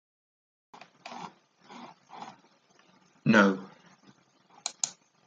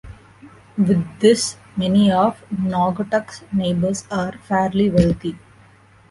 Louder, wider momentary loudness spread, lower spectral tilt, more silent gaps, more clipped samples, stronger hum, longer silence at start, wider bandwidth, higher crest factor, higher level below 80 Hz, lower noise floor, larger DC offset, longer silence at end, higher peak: second, -27 LUFS vs -19 LUFS; first, 26 LU vs 9 LU; second, -4 dB/octave vs -6 dB/octave; neither; neither; neither; first, 1.05 s vs 0.05 s; second, 9.4 kHz vs 11.5 kHz; first, 26 dB vs 18 dB; second, -78 dBFS vs -44 dBFS; first, -63 dBFS vs -50 dBFS; neither; second, 0.35 s vs 0.75 s; second, -8 dBFS vs -2 dBFS